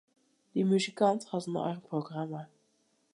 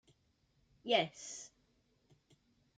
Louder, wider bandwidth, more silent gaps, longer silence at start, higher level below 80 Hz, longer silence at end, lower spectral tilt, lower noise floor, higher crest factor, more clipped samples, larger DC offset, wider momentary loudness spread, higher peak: first, -32 LUFS vs -35 LUFS; first, 11.5 kHz vs 9.4 kHz; neither; second, 0.55 s vs 0.85 s; about the same, -82 dBFS vs -80 dBFS; second, 0.7 s vs 1.3 s; first, -6 dB/octave vs -2.5 dB/octave; about the same, -73 dBFS vs -76 dBFS; second, 20 dB vs 26 dB; neither; neither; second, 10 LU vs 18 LU; first, -12 dBFS vs -18 dBFS